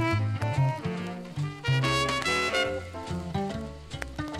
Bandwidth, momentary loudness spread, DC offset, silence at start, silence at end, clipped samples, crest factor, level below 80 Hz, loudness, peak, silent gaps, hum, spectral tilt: 14 kHz; 11 LU; under 0.1%; 0 s; 0 s; under 0.1%; 18 dB; -48 dBFS; -29 LUFS; -12 dBFS; none; none; -5 dB/octave